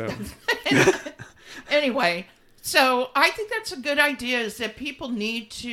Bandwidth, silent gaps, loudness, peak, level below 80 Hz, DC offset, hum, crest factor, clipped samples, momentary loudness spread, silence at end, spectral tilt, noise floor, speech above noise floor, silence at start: 18 kHz; none; -23 LUFS; -2 dBFS; -56 dBFS; under 0.1%; none; 22 dB; under 0.1%; 13 LU; 0 s; -3.5 dB/octave; -43 dBFS; 19 dB; 0 s